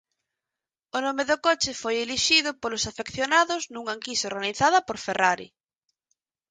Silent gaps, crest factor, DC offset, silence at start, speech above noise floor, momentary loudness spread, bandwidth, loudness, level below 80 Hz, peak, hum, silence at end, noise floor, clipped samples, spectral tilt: none; 20 dB; under 0.1%; 0.95 s; 64 dB; 10 LU; 9.6 kHz; -24 LUFS; -60 dBFS; -6 dBFS; none; 1.05 s; -89 dBFS; under 0.1%; -1.5 dB/octave